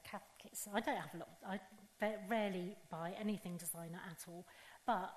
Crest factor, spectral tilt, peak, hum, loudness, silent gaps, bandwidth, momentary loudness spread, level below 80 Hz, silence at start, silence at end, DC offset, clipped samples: 20 dB; -4.5 dB/octave; -24 dBFS; none; -44 LUFS; none; 13 kHz; 13 LU; -78 dBFS; 0 s; 0 s; under 0.1%; under 0.1%